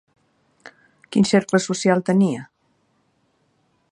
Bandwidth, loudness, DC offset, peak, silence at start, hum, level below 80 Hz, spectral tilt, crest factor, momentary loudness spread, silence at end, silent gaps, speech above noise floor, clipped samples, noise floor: 11 kHz; -19 LUFS; under 0.1%; -2 dBFS; 1.1 s; none; -66 dBFS; -5.5 dB/octave; 20 dB; 6 LU; 1.5 s; none; 47 dB; under 0.1%; -66 dBFS